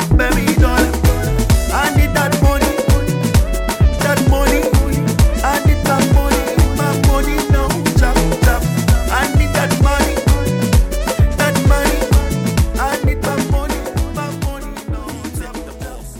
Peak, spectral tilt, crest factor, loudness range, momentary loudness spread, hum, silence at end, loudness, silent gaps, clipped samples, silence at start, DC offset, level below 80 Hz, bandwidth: -2 dBFS; -5.5 dB/octave; 12 dB; 3 LU; 9 LU; none; 0 s; -15 LUFS; none; under 0.1%; 0 s; under 0.1%; -18 dBFS; 17.5 kHz